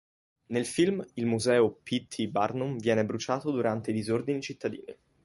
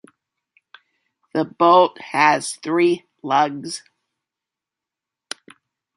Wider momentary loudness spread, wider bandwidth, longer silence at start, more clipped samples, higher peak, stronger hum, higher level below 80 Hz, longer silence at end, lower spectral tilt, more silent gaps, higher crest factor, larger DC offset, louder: second, 9 LU vs 21 LU; about the same, 11.5 kHz vs 11.5 kHz; second, 0.5 s vs 1.35 s; neither; second, -12 dBFS vs -2 dBFS; neither; first, -66 dBFS vs -74 dBFS; second, 0.3 s vs 2.2 s; first, -5.5 dB/octave vs -4 dB/octave; neither; about the same, 18 dB vs 20 dB; neither; second, -29 LUFS vs -18 LUFS